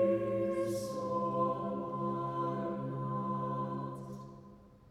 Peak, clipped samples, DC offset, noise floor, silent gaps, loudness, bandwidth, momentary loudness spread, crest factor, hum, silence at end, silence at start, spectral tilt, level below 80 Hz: -20 dBFS; under 0.1%; under 0.1%; -56 dBFS; none; -36 LUFS; 14.5 kHz; 12 LU; 16 dB; none; 0.15 s; 0 s; -8 dB/octave; -66 dBFS